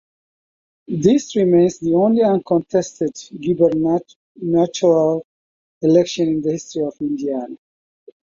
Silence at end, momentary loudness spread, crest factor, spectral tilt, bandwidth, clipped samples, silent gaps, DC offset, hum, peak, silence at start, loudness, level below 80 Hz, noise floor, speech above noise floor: 0.85 s; 10 LU; 16 dB; -6.5 dB/octave; 7.6 kHz; under 0.1%; 4.16-4.35 s, 5.24-5.81 s; under 0.1%; none; -2 dBFS; 0.9 s; -18 LUFS; -58 dBFS; under -90 dBFS; over 73 dB